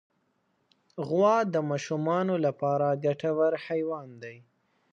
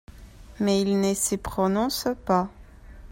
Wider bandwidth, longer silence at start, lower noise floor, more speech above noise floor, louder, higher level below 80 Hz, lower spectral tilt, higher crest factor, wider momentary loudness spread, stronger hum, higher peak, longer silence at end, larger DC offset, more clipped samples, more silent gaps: second, 7.8 kHz vs 16.5 kHz; first, 0.95 s vs 0.15 s; first, -73 dBFS vs -45 dBFS; first, 46 dB vs 21 dB; about the same, -27 LUFS vs -25 LUFS; second, -78 dBFS vs -46 dBFS; first, -7 dB/octave vs -4.5 dB/octave; about the same, 18 dB vs 16 dB; first, 17 LU vs 5 LU; neither; about the same, -10 dBFS vs -10 dBFS; first, 0.55 s vs 0 s; neither; neither; neither